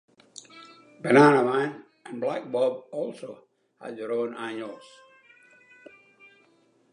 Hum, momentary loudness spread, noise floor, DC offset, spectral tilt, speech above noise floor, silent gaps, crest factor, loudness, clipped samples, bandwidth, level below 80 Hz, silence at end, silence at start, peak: none; 27 LU; -63 dBFS; under 0.1%; -6.5 dB/octave; 39 dB; none; 22 dB; -25 LUFS; under 0.1%; 11 kHz; -82 dBFS; 2.15 s; 0.55 s; -6 dBFS